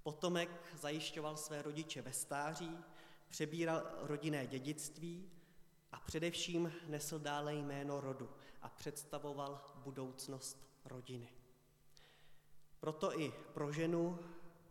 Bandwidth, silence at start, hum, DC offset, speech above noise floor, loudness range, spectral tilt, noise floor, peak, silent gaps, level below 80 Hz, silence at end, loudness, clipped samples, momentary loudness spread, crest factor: 17 kHz; 0.05 s; none; under 0.1%; 24 dB; 6 LU; -4.5 dB/octave; -68 dBFS; -24 dBFS; none; -74 dBFS; 0 s; -44 LUFS; under 0.1%; 15 LU; 20 dB